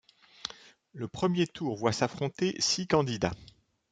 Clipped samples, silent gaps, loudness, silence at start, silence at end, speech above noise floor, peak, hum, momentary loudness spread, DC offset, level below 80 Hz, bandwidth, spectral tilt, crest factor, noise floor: under 0.1%; none; -30 LUFS; 0.45 s; 0.45 s; 23 dB; -12 dBFS; none; 14 LU; under 0.1%; -60 dBFS; 9.4 kHz; -4.5 dB/octave; 20 dB; -53 dBFS